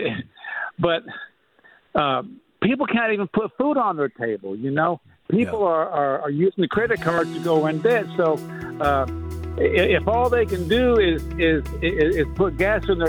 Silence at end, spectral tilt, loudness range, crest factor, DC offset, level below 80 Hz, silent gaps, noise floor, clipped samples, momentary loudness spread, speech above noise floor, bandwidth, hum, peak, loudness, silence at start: 0 s; -7 dB/octave; 3 LU; 20 dB; under 0.1%; -38 dBFS; none; -55 dBFS; under 0.1%; 9 LU; 34 dB; 19 kHz; none; -2 dBFS; -22 LUFS; 0 s